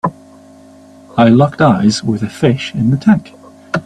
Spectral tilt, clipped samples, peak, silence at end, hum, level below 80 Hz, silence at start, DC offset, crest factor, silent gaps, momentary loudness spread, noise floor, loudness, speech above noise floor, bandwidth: -6.5 dB/octave; under 0.1%; 0 dBFS; 0.05 s; none; -48 dBFS; 0.05 s; under 0.1%; 14 dB; none; 11 LU; -40 dBFS; -13 LUFS; 29 dB; 11 kHz